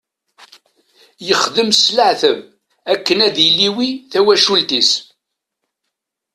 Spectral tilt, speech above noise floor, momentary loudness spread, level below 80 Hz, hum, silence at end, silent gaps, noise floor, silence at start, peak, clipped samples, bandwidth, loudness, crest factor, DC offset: -2 dB/octave; 63 dB; 10 LU; -62 dBFS; none; 1.3 s; none; -77 dBFS; 1.2 s; 0 dBFS; under 0.1%; 14 kHz; -13 LUFS; 16 dB; under 0.1%